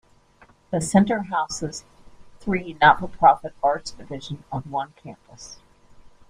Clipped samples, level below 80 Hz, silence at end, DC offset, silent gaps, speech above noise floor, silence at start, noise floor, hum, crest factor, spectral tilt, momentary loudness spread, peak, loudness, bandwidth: under 0.1%; -50 dBFS; 0.75 s; under 0.1%; none; 33 dB; 0.7 s; -55 dBFS; none; 22 dB; -5 dB/octave; 24 LU; -2 dBFS; -22 LUFS; 15 kHz